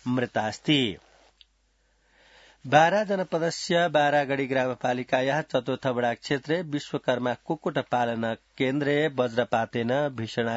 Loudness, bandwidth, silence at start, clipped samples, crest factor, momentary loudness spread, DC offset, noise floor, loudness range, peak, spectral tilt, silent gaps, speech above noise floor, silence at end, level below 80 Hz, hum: -26 LUFS; 8 kHz; 0.05 s; under 0.1%; 22 dB; 7 LU; under 0.1%; -68 dBFS; 3 LU; -4 dBFS; -5.5 dB/octave; none; 42 dB; 0 s; -66 dBFS; none